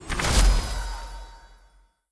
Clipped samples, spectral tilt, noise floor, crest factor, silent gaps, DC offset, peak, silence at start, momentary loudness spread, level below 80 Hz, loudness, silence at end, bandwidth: under 0.1%; -3.5 dB/octave; -58 dBFS; 18 dB; none; under 0.1%; -8 dBFS; 0 s; 22 LU; -26 dBFS; -25 LUFS; 0.65 s; 11 kHz